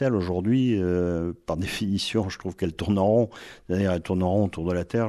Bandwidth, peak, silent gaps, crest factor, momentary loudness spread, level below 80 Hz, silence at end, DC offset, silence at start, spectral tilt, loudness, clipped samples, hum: 13 kHz; -10 dBFS; none; 16 dB; 8 LU; -52 dBFS; 0 s; under 0.1%; 0 s; -7 dB/octave; -25 LUFS; under 0.1%; none